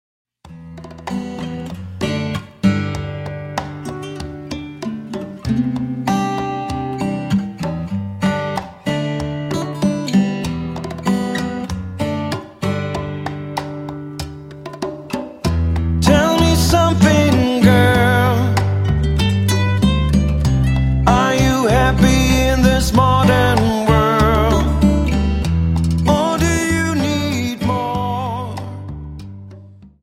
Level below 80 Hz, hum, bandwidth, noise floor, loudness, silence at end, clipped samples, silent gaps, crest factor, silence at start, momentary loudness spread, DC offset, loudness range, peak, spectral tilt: -26 dBFS; none; 16.5 kHz; -40 dBFS; -17 LUFS; 0.15 s; under 0.1%; none; 16 dB; 0.45 s; 15 LU; under 0.1%; 10 LU; 0 dBFS; -6 dB/octave